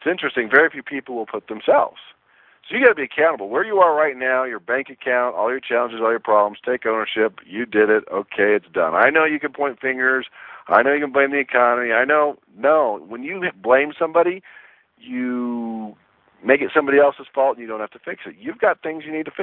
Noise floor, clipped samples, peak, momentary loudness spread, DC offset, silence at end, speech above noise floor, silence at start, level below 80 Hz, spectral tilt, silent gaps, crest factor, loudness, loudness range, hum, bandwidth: -52 dBFS; under 0.1%; 0 dBFS; 13 LU; under 0.1%; 0 s; 32 dB; 0 s; -68 dBFS; -8.5 dB/octave; none; 20 dB; -19 LUFS; 3 LU; none; 4.2 kHz